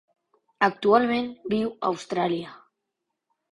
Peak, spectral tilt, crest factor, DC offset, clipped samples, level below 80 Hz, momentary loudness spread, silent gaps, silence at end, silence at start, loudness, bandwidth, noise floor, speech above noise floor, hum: -6 dBFS; -6 dB/octave; 20 dB; under 0.1%; under 0.1%; -66 dBFS; 9 LU; none; 0.95 s; 0.6 s; -25 LUFS; 11 kHz; -82 dBFS; 58 dB; none